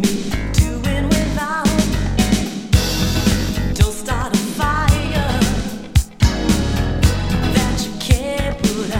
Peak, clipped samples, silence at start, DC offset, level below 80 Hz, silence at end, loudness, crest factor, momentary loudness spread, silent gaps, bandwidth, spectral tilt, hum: 0 dBFS; under 0.1%; 0 s; under 0.1%; -22 dBFS; 0 s; -18 LUFS; 16 dB; 3 LU; none; 17 kHz; -5 dB/octave; none